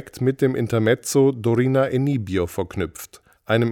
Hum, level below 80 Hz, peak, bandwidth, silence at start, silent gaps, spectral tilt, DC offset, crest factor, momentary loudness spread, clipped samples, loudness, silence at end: none; -54 dBFS; -4 dBFS; 18 kHz; 0 s; none; -6.5 dB/octave; under 0.1%; 16 dB; 10 LU; under 0.1%; -21 LUFS; 0 s